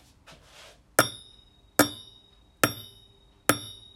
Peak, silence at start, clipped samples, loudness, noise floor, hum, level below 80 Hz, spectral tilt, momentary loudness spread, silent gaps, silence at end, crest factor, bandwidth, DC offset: -4 dBFS; 1 s; under 0.1%; -27 LUFS; -58 dBFS; none; -60 dBFS; -2.5 dB/octave; 20 LU; none; 0.25 s; 28 dB; 16.5 kHz; under 0.1%